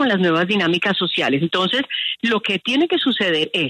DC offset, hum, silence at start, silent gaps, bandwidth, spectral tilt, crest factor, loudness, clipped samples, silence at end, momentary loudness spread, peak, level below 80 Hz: under 0.1%; none; 0 s; none; 12 kHz; -5.5 dB/octave; 12 dB; -18 LUFS; under 0.1%; 0 s; 3 LU; -6 dBFS; -64 dBFS